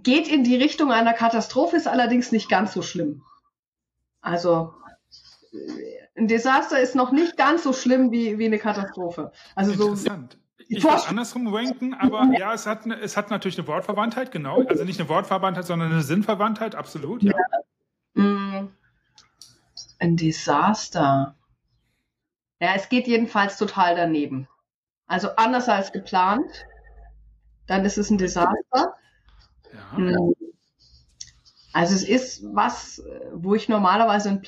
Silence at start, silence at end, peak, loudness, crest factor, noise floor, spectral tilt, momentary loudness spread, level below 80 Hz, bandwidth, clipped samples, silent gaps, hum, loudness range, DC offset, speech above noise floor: 0.05 s; 0 s; -8 dBFS; -22 LUFS; 16 dB; -85 dBFS; -5.5 dB/octave; 14 LU; -56 dBFS; 14 kHz; under 0.1%; 3.59-3.72 s, 24.76-24.87 s; none; 5 LU; under 0.1%; 63 dB